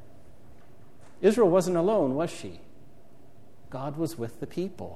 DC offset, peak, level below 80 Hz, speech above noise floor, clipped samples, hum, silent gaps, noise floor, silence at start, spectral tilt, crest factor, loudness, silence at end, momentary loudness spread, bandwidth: 0.8%; -10 dBFS; -62 dBFS; 30 dB; under 0.1%; none; none; -56 dBFS; 1.2 s; -6.5 dB/octave; 20 dB; -27 LUFS; 0 s; 16 LU; 14.5 kHz